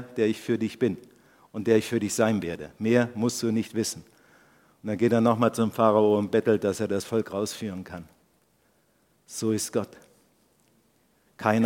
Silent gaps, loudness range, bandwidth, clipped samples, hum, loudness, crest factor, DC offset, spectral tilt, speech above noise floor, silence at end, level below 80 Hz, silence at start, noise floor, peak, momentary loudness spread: none; 10 LU; 16.5 kHz; under 0.1%; none; -26 LUFS; 22 dB; under 0.1%; -5.5 dB/octave; 41 dB; 0 s; -66 dBFS; 0 s; -66 dBFS; -6 dBFS; 16 LU